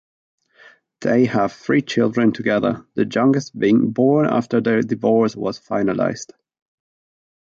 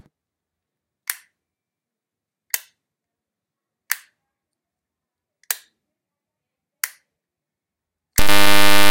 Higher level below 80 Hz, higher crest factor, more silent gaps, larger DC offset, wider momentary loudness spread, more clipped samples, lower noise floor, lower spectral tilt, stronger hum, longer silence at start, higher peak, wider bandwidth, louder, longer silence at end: second, -60 dBFS vs -40 dBFS; about the same, 16 dB vs 18 dB; neither; neither; second, 7 LU vs 15 LU; neither; second, -50 dBFS vs -87 dBFS; first, -6.5 dB/octave vs -2 dB/octave; neither; first, 1 s vs 0 s; second, -4 dBFS vs 0 dBFS; second, 7.4 kHz vs 17.5 kHz; about the same, -19 LUFS vs -21 LUFS; first, 1.2 s vs 0 s